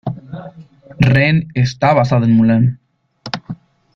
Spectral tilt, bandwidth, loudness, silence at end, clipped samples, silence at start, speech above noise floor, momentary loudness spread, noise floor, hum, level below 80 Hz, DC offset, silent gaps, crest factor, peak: -8 dB/octave; 7 kHz; -14 LUFS; 0.4 s; under 0.1%; 0.05 s; 28 dB; 21 LU; -40 dBFS; none; -44 dBFS; under 0.1%; none; 14 dB; -2 dBFS